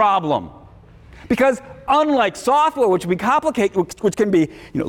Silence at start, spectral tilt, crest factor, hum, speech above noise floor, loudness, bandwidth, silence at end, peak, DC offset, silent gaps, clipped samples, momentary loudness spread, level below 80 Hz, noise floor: 0 s; -5.5 dB/octave; 12 dB; none; 26 dB; -18 LUFS; 17.5 kHz; 0 s; -6 dBFS; under 0.1%; none; under 0.1%; 7 LU; -48 dBFS; -44 dBFS